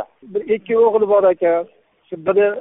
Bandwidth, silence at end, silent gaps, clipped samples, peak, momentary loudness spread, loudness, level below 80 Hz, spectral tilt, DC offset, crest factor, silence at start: 3.9 kHz; 0 s; none; under 0.1%; -4 dBFS; 13 LU; -17 LUFS; -62 dBFS; -1 dB/octave; under 0.1%; 14 dB; 0 s